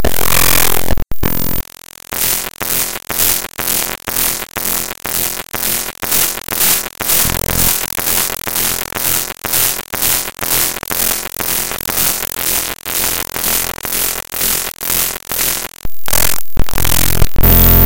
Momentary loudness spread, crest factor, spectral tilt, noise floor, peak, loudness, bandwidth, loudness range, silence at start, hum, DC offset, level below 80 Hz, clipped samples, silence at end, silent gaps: 6 LU; 14 dB; -2 dB/octave; -36 dBFS; 0 dBFS; -14 LUFS; over 20 kHz; 2 LU; 0 s; none; under 0.1%; -24 dBFS; 0.3%; 0 s; none